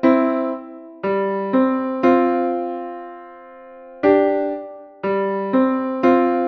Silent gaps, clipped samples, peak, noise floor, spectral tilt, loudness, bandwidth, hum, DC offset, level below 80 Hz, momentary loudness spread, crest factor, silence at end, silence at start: none; under 0.1%; -4 dBFS; -40 dBFS; -8.5 dB/octave; -19 LUFS; 5.8 kHz; none; under 0.1%; -60 dBFS; 17 LU; 16 dB; 0 s; 0 s